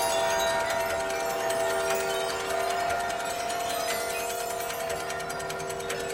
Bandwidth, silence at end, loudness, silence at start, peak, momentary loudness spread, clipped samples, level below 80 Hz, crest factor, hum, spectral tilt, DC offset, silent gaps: 17 kHz; 0 s; -29 LUFS; 0 s; -14 dBFS; 6 LU; under 0.1%; -56 dBFS; 14 dB; none; -2 dB/octave; under 0.1%; none